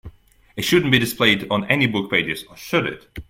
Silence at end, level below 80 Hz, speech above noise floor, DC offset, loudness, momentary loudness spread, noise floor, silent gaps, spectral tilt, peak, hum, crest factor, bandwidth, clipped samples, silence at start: 0.05 s; -48 dBFS; 25 dB; under 0.1%; -19 LUFS; 11 LU; -45 dBFS; none; -4.5 dB/octave; 0 dBFS; none; 20 dB; 16.5 kHz; under 0.1%; 0.05 s